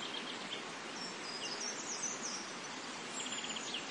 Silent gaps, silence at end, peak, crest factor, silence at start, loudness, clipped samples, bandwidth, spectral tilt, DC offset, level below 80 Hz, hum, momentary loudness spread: none; 0 s; -28 dBFS; 14 dB; 0 s; -40 LUFS; under 0.1%; 11.5 kHz; -0.5 dB/octave; under 0.1%; -88 dBFS; none; 5 LU